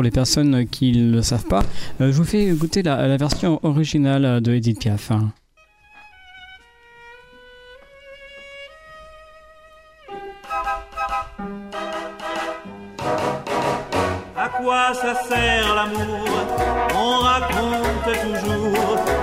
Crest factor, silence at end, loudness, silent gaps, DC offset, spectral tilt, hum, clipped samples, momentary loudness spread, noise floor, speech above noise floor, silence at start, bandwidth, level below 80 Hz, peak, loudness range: 16 dB; 0 s; -20 LUFS; none; under 0.1%; -5.5 dB/octave; none; under 0.1%; 16 LU; -55 dBFS; 37 dB; 0 s; 16 kHz; -36 dBFS; -6 dBFS; 21 LU